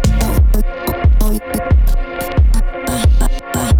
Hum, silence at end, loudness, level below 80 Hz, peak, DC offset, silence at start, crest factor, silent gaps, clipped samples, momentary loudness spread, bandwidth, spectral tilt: none; 0 s; -16 LUFS; -14 dBFS; -2 dBFS; under 0.1%; 0 s; 10 dB; none; under 0.1%; 6 LU; 19 kHz; -6 dB/octave